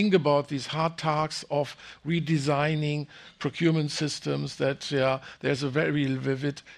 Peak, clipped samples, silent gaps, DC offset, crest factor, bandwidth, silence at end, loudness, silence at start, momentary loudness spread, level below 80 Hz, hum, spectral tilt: -8 dBFS; under 0.1%; none; under 0.1%; 18 dB; 11.5 kHz; 0 s; -28 LUFS; 0 s; 6 LU; -64 dBFS; none; -6 dB/octave